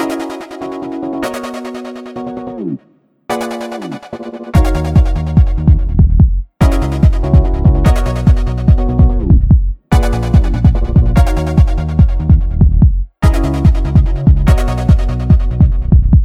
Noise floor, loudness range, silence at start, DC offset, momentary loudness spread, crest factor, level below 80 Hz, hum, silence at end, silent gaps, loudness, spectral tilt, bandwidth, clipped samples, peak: -51 dBFS; 10 LU; 0 s; under 0.1%; 13 LU; 10 dB; -14 dBFS; none; 0 s; none; -13 LUFS; -8 dB/octave; 12.5 kHz; under 0.1%; 0 dBFS